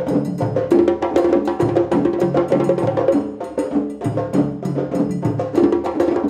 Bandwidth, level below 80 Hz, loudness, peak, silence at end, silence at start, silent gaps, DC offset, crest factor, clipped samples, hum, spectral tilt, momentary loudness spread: 12.5 kHz; -50 dBFS; -19 LUFS; -4 dBFS; 0 s; 0 s; none; under 0.1%; 14 dB; under 0.1%; none; -8.5 dB/octave; 6 LU